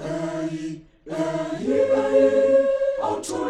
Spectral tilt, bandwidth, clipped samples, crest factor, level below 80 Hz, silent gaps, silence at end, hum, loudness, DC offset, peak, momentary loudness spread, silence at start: -5.5 dB/octave; 11.5 kHz; under 0.1%; 16 dB; -54 dBFS; none; 0 s; none; -21 LUFS; under 0.1%; -6 dBFS; 15 LU; 0 s